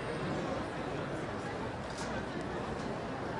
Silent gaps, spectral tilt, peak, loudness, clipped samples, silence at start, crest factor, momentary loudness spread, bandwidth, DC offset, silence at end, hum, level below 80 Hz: none; -6 dB/octave; -24 dBFS; -38 LUFS; under 0.1%; 0 s; 14 dB; 3 LU; 11.5 kHz; under 0.1%; 0 s; none; -54 dBFS